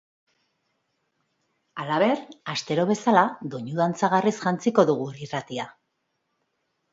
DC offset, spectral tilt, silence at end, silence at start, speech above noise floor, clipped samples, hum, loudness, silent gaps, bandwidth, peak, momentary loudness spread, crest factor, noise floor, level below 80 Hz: under 0.1%; -5.5 dB/octave; 1.2 s; 1.75 s; 53 dB; under 0.1%; none; -24 LUFS; none; 8 kHz; -4 dBFS; 14 LU; 22 dB; -76 dBFS; -72 dBFS